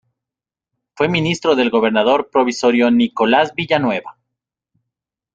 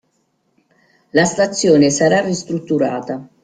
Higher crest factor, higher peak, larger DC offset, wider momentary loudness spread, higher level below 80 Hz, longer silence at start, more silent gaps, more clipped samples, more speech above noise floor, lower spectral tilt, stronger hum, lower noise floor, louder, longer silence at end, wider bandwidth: about the same, 16 dB vs 16 dB; about the same, -2 dBFS vs -2 dBFS; neither; second, 4 LU vs 10 LU; about the same, -58 dBFS vs -56 dBFS; second, 0.95 s vs 1.15 s; neither; neither; first, 72 dB vs 49 dB; about the same, -5.5 dB/octave vs -4.5 dB/octave; neither; first, -88 dBFS vs -65 dBFS; about the same, -16 LUFS vs -16 LUFS; first, 1.25 s vs 0.15 s; second, 7.8 kHz vs 9.6 kHz